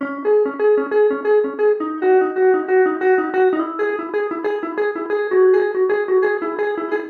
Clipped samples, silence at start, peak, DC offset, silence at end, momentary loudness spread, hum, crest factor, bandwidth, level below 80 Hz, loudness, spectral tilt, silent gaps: under 0.1%; 0 s; -6 dBFS; under 0.1%; 0 s; 7 LU; none; 12 dB; 4.5 kHz; -76 dBFS; -18 LUFS; -7 dB/octave; none